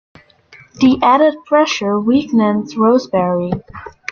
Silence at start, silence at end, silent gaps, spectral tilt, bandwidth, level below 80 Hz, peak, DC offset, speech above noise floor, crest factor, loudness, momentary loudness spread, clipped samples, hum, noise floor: 0.8 s; 0.2 s; none; -6 dB/octave; 7 kHz; -50 dBFS; -2 dBFS; under 0.1%; 31 dB; 14 dB; -14 LUFS; 11 LU; under 0.1%; none; -45 dBFS